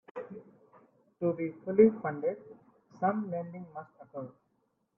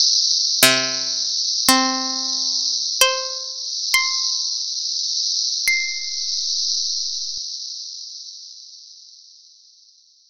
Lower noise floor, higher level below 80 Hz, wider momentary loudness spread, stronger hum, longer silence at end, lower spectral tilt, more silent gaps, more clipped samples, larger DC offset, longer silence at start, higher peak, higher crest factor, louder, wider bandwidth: first, -76 dBFS vs -53 dBFS; second, -74 dBFS vs -66 dBFS; first, 22 LU vs 16 LU; neither; second, 0.7 s vs 1.05 s; first, -11.5 dB/octave vs 0.5 dB/octave; neither; neither; neither; first, 0.15 s vs 0 s; second, -10 dBFS vs 0 dBFS; about the same, 22 dB vs 22 dB; second, -30 LUFS vs -18 LUFS; second, 2.9 kHz vs 16.5 kHz